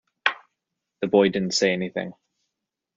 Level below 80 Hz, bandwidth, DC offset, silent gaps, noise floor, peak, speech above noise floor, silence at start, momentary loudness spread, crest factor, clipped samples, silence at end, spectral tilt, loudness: -66 dBFS; 7.4 kHz; under 0.1%; none; -83 dBFS; -2 dBFS; 61 dB; 0.25 s; 14 LU; 24 dB; under 0.1%; 0.85 s; -3.5 dB/octave; -23 LUFS